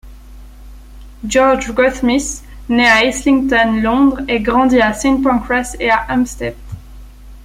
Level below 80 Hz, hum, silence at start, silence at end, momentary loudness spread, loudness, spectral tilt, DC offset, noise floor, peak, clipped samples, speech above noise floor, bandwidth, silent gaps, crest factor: -34 dBFS; none; 0.05 s; 0 s; 14 LU; -14 LUFS; -4 dB/octave; under 0.1%; -36 dBFS; 0 dBFS; under 0.1%; 22 dB; 15.5 kHz; none; 14 dB